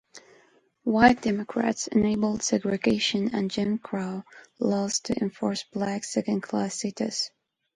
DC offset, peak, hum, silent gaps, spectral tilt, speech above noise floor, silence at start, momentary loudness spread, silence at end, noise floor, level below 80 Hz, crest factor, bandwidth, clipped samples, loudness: under 0.1%; -4 dBFS; none; none; -4 dB/octave; 35 dB; 0.15 s; 9 LU; 0.45 s; -61 dBFS; -56 dBFS; 22 dB; 11.5 kHz; under 0.1%; -26 LUFS